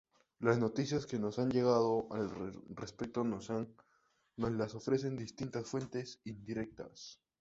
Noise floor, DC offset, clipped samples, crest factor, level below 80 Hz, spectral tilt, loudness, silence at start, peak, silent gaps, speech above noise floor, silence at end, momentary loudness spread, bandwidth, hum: -74 dBFS; under 0.1%; under 0.1%; 22 dB; -66 dBFS; -6.5 dB/octave; -37 LUFS; 0.4 s; -16 dBFS; none; 37 dB; 0.25 s; 16 LU; 8 kHz; none